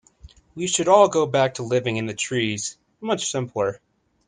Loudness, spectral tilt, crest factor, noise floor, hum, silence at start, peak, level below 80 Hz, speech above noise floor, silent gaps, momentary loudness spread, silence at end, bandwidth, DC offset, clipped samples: -22 LUFS; -4 dB/octave; 20 dB; -49 dBFS; none; 0.25 s; -2 dBFS; -58 dBFS; 28 dB; none; 13 LU; 0.5 s; 10 kHz; under 0.1%; under 0.1%